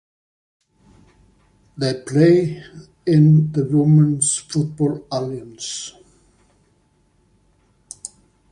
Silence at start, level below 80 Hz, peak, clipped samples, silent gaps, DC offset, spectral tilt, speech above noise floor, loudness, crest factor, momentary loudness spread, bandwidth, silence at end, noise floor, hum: 1.75 s; -56 dBFS; -2 dBFS; under 0.1%; none; under 0.1%; -6 dB/octave; 43 dB; -18 LUFS; 18 dB; 21 LU; 10.5 kHz; 0.45 s; -61 dBFS; none